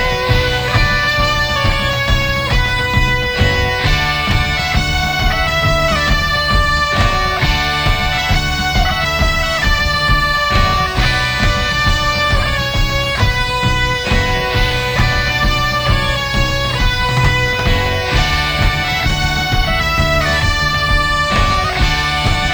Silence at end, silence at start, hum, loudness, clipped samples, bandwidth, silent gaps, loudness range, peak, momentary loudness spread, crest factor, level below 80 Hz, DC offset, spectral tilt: 0 s; 0 s; none; -14 LUFS; under 0.1%; over 20 kHz; none; 1 LU; 0 dBFS; 2 LU; 14 dB; -20 dBFS; under 0.1%; -4 dB/octave